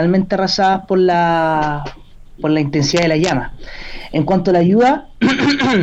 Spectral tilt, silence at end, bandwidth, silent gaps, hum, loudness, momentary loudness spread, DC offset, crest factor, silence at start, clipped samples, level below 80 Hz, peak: -5.5 dB/octave; 0 s; 8.4 kHz; none; none; -15 LUFS; 12 LU; under 0.1%; 10 dB; 0 s; under 0.1%; -38 dBFS; -4 dBFS